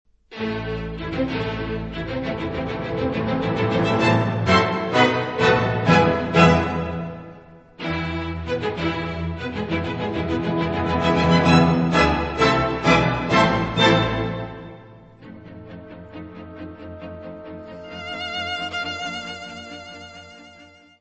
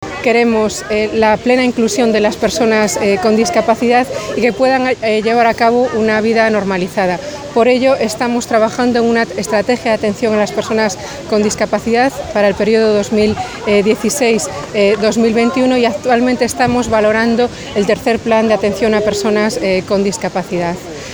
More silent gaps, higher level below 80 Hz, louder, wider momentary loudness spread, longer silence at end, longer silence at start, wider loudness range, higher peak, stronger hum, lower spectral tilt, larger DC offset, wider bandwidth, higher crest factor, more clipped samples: neither; about the same, -40 dBFS vs -42 dBFS; second, -21 LUFS vs -13 LUFS; first, 21 LU vs 5 LU; first, 0.35 s vs 0 s; first, 0.3 s vs 0 s; first, 13 LU vs 2 LU; about the same, -2 dBFS vs 0 dBFS; neither; first, -6 dB/octave vs -4.5 dB/octave; neither; second, 8.4 kHz vs over 20 kHz; first, 20 dB vs 14 dB; neither